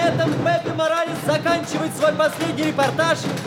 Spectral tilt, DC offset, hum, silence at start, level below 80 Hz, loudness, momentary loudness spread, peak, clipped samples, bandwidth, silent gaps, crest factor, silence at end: -5 dB/octave; under 0.1%; none; 0 s; -58 dBFS; -20 LUFS; 3 LU; -4 dBFS; under 0.1%; 17 kHz; none; 16 dB; 0 s